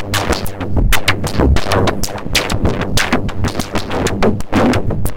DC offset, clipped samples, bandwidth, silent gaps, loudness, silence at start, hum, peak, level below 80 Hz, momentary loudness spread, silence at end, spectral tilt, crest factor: under 0.1%; under 0.1%; 17 kHz; none; -16 LUFS; 0 s; none; 0 dBFS; -22 dBFS; 6 LU; 0 s; -4.5 dB/octave; 14 dB